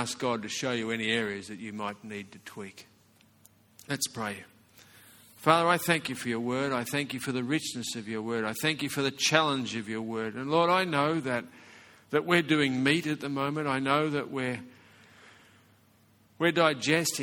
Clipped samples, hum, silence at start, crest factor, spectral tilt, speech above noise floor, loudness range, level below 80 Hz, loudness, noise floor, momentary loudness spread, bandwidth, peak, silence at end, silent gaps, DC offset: under 0.1%; none; 0 s; 26 dB; -4 dB/octave; 34 dB; 8 LU; -70 dBFS; -29 LUFS; -63 dBFS; 13 LU; 18.5 kHz; -4 dBFS; 0 s; none; under 0.1%